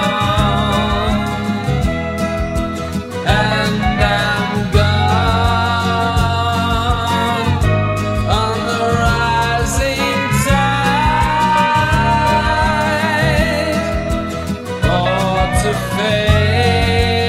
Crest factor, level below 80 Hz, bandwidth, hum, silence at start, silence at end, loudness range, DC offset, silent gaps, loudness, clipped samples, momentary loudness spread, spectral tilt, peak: 14 dB; -24 dBFS; 15.5 kHz; none; 0 s; 0 s; 3 LU; under 0.1%; none; -15 LUFS; under 0.1%; 6 LU; -5.5 dB/octave; 0 dBFS